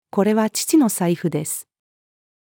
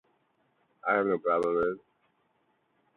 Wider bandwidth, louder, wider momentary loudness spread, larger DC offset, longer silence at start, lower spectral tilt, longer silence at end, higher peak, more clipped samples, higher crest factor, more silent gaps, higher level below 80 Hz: first, over 20 kHz vs 6.8 kHz; first, -20 LUFS vs -29 LUFS; about the same, 9 LU vs 9 LU; neither; second, 0.15 s vs 0.85 s; second, -5 dB/octave vs -7.5 dB/octave; second, 0.9 s vs 1.2 s; first, -6 dBFS vs -12 dBFS; neither; about the same, 16 dB vs 20 dB; neither; second, -78 dBFS vs -68 dBFS